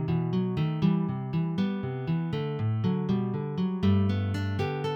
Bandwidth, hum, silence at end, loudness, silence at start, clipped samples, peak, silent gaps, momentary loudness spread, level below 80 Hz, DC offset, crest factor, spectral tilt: 7 kHz; none; 0 s; -28 LUFS; 0 s; under 0.1%; -12 dBFS; none; 5 LU; -58 dBFS; under 0.1%; 14 dB; -9 dB/octave